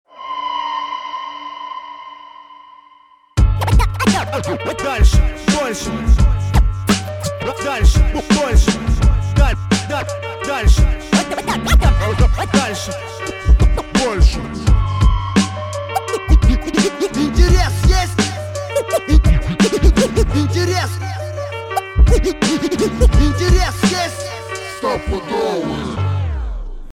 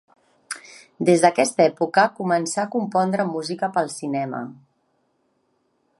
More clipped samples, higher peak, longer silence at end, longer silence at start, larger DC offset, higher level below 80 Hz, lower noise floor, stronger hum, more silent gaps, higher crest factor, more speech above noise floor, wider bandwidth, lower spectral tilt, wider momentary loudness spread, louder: neither; about the same, 0 dBFS vs 0 dBFS; second, 0 s vs 1.45 s; second, 0.15 s vs 0.5 s; neither; first, -18 dBFS vs -74 dBFS; second, -48 dBFS vs -68 dBFS; neither; neither; second, 14 dB vs 22 dB; second, 34 dB vs 48 dB; first, 14 kHz vs 11.5 kHz; about the same, -5.5 dB/octave vs -4.5 dB/octave; second, 11 LU vs 17 LU; first, -17 LUFS vs -21 LUFS